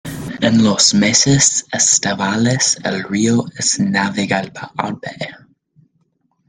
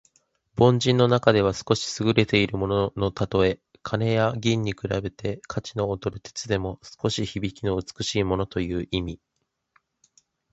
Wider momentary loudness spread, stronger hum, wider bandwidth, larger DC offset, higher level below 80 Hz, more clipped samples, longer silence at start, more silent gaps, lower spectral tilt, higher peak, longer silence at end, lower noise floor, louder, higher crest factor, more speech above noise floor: first, 15 LU vs 12 LU; neither; first, 13 kHz vs 8.2 kHz; neither; about the same, -50 dBFS vs -46 dBFS; neither; second, 0.05 s vs 0.55 s; neither; second, -3 dB/octave vs -5.5 dB/octave; about the same, 0 dBFS vs 0 dBFS; second, 1.1 s vs 1.4 s; about the same, -64 dBFS vs -67 dBFS; first, -14 LUFS vs -25 LUFS; second, 16 dB vs 24 dB; first, 48 dB vs 43 dB